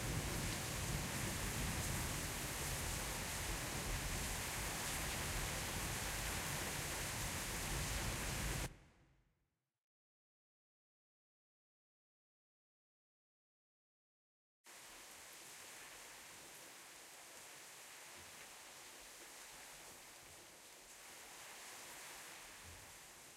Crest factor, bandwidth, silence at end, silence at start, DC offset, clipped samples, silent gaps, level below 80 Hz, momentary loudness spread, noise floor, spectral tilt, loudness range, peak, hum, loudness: 18 dB; 16 kHz; 0 s; 0 s; under 0.1%; under 0.1%; 9.84-14.64 s; -54 dBFS; 14 LU; -87 dBFS; -2.5 dB/octave; 14 LU; -28 dBFS; none; -44 LUFS